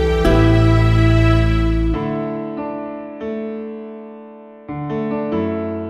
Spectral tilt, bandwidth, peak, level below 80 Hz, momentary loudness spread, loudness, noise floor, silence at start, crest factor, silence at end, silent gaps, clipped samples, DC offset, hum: -8 dB/octave; 8.4 kHz; -2 dBFS; -24 dBFS; 19 LU; -18 LUFS; -38 dBFS; 0 s; 16 dB; 0 s; none; under 0.1%; under 0.1%; none